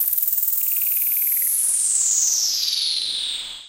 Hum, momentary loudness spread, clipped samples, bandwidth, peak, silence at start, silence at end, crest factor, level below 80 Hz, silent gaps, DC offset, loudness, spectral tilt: none; 5 LU; under 0.1%; 17.5 kHz; -4 dBFS; 0 s; 0 s; 18 dB; -62 dBFS; none; under 0.1%; -18 LUFS; 4.5 dB/octave